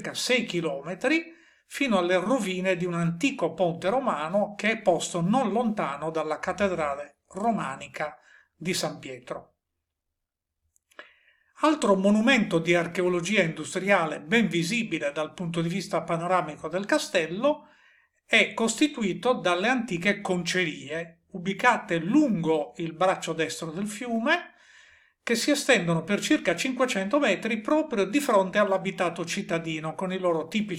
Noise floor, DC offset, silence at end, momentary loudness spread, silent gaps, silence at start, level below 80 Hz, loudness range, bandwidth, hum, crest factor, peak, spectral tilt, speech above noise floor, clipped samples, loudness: -85 dBFS; under 0.1%; 0 s; 10 LU; none; 0 s; -66 dBFS; 6 LU; 16 kHz; none; 20 dB; -6 dBFS; -4.5 dB/octave; 59 dB; under 0.1%; -26 LUFS